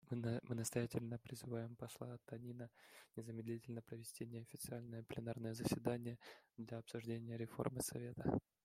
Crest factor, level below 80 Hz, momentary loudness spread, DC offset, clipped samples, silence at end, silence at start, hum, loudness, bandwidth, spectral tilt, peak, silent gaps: 24 dB; -72 dBFS; 11 LU; under 0.1%; under 0.1%; 0.25 s; 0.05 s; none; -47 LUFS; 16 kHz; -6 dB/octave; -24 dBFS; none